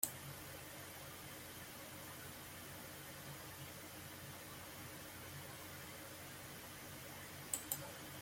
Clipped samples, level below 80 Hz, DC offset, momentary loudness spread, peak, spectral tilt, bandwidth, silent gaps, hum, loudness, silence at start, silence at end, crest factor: under 0.1%; -72 dBFS; under 0.1%; 7 LU; -16 dBFS; -2.5 dB/octave; 16.5 kHz; none; none; -50 LUFS; 0 s; 0 s; 34 dB